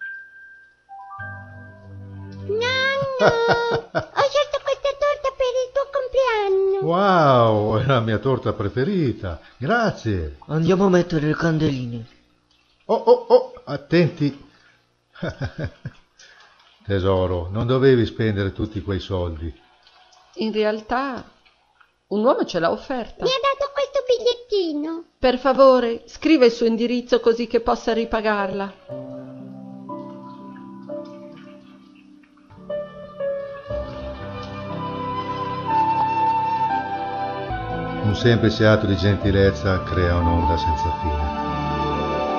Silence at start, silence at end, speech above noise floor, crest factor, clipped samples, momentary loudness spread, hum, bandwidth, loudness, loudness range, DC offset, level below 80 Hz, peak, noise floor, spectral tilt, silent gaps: 0 s; 0 s; 41 dB; 20 dB; under 0.1%; 18 LU; none; 7 kHz; -21 LUFS; 11 LU; under 0.1%; -40 dBFS; 0 dBFS; -61 dBFS; -6.5 dB/octave; none